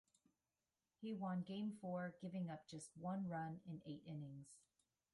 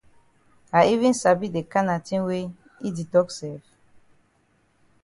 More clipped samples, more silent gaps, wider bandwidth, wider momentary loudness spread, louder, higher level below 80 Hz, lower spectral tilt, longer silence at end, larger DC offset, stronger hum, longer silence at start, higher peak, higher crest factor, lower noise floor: neither; neither; about the same, 11.5 kHz vs 11.5 kHz; second, 10 LU vs 15 LU; second, -50 LUFS vs -23 LUFS; second, -84 dBFS vs -62 dBFS; about the same, -6.5 dB/octave vs -5.5 dB/octave; second, 0.55 s vs 1.45 s; neither; neither; first, 1 s vs 0.75 s; second, -36 dBFS vs -4 dBFS; second, 14 dB vs 20 dB; first, under -90 dBFS vs -65 dBFS